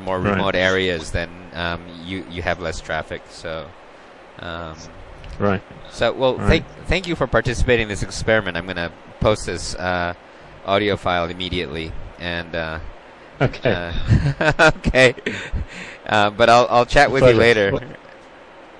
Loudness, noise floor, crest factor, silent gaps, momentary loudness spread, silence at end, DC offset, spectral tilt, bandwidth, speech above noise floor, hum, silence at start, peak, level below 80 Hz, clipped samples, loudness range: -19 LUFS; -43 dBFS; 20 dB; none; 18 LU; 0 s; under 0.1%; -5 dB/octave; 11.5 kHz; 24 dB; none; 0 s; 0 dBFS; -34 dBFS; under 0.1%; 12 LU